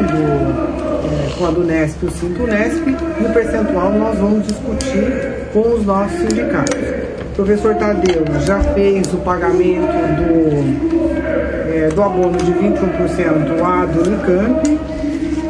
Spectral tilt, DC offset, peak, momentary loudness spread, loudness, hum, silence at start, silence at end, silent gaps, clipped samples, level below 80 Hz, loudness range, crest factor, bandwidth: -7 dB/octave; under 0.1%; 0 dBFS; 5 LU; -16 LUFS; none; 0 s; 0 s; none; under 0.1%; -30 dBFS; 2 LU; 14 dB; 10.5 kHz